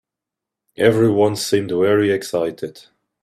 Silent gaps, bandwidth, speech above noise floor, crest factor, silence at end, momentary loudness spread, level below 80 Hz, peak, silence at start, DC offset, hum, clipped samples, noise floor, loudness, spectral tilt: none; 15.5 kHz; 68 dB; 18 dB; 0.45 s; 10 LU; -58 dBFS; 0 dBFS; 0.8 s; under 0.1%; none; under 0.1%; -85 dBFS; -17 LUFS; -5.5 dB/octave